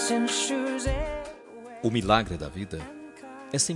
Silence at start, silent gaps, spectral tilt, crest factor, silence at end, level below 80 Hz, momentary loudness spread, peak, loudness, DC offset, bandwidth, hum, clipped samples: 0 s; none; -3.5 dB/octave; 22 dB; 0 s; -42 dBFS; 20 LU; -6 dBFS; -28 LUFS; under 0.1%; 12 kHz; none; under 0.1%